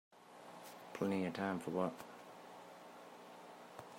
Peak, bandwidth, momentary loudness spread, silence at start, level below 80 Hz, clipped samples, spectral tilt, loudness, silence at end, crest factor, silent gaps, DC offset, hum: -24 dBFS; 16 kHz; 17 LU; 0.1 s; -88 dBFS; under 0.1%; -6 dB/octave; -42 LUFS; 0 s; 20 dB; none; under 0.1%; 60 Hz at -65 dBFS